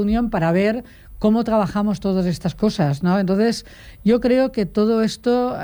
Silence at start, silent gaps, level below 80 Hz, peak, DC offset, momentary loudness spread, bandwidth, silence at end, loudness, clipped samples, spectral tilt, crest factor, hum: 0 s; none; -40 dBFS; -6 dBFS; under 0.1%; 4 LU; over 20 kHz; 0 s; -19 LUFS; under 0.1%; -7 dB/octave; 12 dB; none